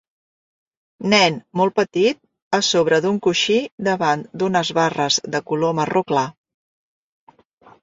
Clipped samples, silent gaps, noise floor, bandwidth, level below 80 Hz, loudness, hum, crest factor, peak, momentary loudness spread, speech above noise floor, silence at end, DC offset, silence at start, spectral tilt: under 0.1%; 2.42-2.51 s, 3.72-3.78 s; -52 dBFS; 7.8 kHz; -62 dBFS; -19 LUFS; none; 18 dB; -2 dBFS; 6 LU; 33 dB; 1.5 s; under 0.1%; 1 s; -4 dB/octave